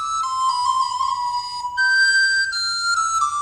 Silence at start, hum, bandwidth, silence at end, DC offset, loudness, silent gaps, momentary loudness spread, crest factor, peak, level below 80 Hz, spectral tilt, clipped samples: 0 s; none; 13.5 kHz; 0 s; under 0.1%; -19 LUFS; none; 9 LU; 12 dB; -8 dBFS; -58 dBFS; 3.5 dB/octave; under 0.1%